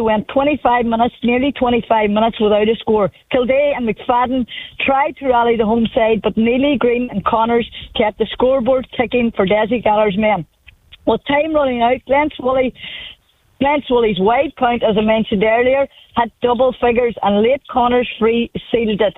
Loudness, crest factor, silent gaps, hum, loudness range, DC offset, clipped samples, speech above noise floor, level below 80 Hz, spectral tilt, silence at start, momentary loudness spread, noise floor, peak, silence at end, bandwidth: -16 LUFS; 14 dB; none; none; 2 LU; under 0.1%; under 0.1%; 30 dB; -42 dBFS; -8.5 dB/octave; 0 s; 5 LU; -45 dBFS; -2 dBFS; 0.05 s; 4 kHz